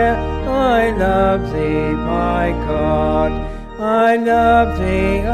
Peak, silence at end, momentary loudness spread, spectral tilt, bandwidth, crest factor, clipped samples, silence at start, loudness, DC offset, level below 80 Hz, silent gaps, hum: -2 dBFS; 0 s; 6 LU; -7.5 dB/octave; 14 kHz; 14 dB; under 0.1%; 0 s; -16 LUFS; under 0.1%; -26 dBFS; none; none